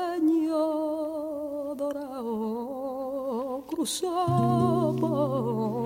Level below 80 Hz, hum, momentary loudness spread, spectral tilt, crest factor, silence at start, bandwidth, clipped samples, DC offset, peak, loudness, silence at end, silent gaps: -62 dBFS; none; 9 LU; -6.5 dB/octave; 14 dB; 0 s; 17 kHz; under 0.1%; under 0.1%; -12 dBFS; -28 LUFS; 0 s; none